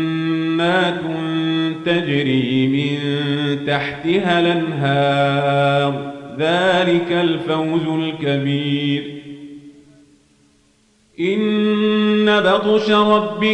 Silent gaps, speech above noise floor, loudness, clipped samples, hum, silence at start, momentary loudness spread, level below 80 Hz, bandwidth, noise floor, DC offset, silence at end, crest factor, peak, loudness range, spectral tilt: none; 40 dB; -17 LUFS; under 0.1%; none; 0 s; 7 LU; -60 dBFS; 9.2 kHz; -57 dBFS; under 0.1%; 0 s; 14 dB; -4 dBFS; 6 LU; -7 dB/octave